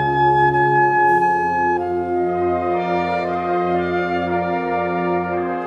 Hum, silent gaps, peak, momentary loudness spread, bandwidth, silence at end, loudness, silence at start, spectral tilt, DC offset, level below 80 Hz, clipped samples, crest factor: none; none; -6 dBFS; 6 LU; 6.8 kHz; 0 s; -18 LUFS; 0 s; -8 dB/octave; under 0.1%; -50 dBFS; under 0.1%; 12 dB